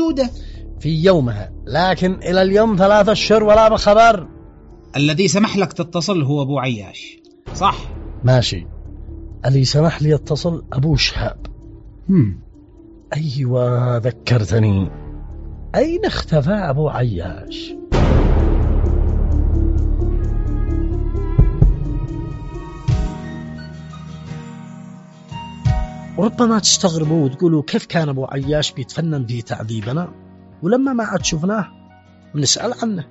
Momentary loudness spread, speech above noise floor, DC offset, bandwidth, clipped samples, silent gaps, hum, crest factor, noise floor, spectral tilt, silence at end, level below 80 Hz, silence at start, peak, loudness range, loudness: 19 LU; 29 dB; under 0.1%; 8 kHz; under 0.1%; none; none; 16 dB; -45 dBFS; -5.5 dB/octave; 0.05 s; -24 dBFS; 0 s; 0 dBFS; 8 LU; -17 LUFS